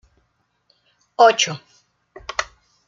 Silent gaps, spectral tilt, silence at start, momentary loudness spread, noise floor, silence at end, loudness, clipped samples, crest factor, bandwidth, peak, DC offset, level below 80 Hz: none; -1.5 dB/octave; 1.2 s; 23 LU; -68 dBFS; 0.45 s; -18 LUFS; under 0.1%; 22 dB; 7.6 kHz; -2 dBFS; under 0.1%; -58 dBFS